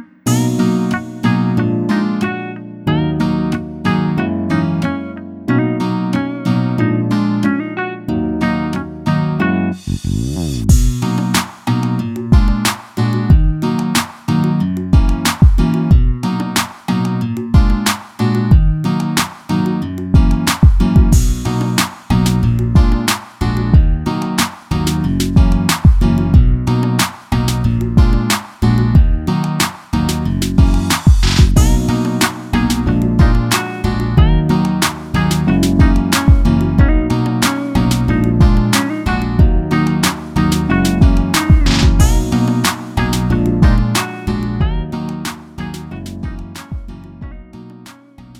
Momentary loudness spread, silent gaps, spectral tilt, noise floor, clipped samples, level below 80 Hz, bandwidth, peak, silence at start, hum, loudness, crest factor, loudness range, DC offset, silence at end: 8 LU; none; -5.5 dB/octave; -39 dBFS; under 0.1%; -18 dBFS; 16.5 kHz; 0 dBFS; 0 s; none; -15 LUFS; 14 dB; 4 LU; under 0.1%; 0 s